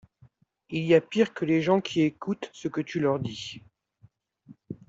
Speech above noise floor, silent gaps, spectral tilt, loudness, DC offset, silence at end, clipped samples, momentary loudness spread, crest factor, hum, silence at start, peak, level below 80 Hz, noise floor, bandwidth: 35 dB; none; -6.5 dB/octave; -27 LUFS; under 0.1%; 0.15 s; under 0.1%; 14 LU; 20 dB; none; 0.7 s; -8 dBFS; -66 dBFS; -61 dBFS; 7.8 kHz